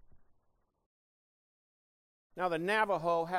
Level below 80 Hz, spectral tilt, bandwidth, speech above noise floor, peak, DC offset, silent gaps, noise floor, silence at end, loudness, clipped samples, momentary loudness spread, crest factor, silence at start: -70 dBFS; -5.5 dB/octave; 16 kHz; 43 dB; -16 dBFS; under 0.1%; 0.86-2.30 s; -75 dBFS; 0 s; -32 LUFS; under 0.1%; 9 LU; 20 dB; 0.15 s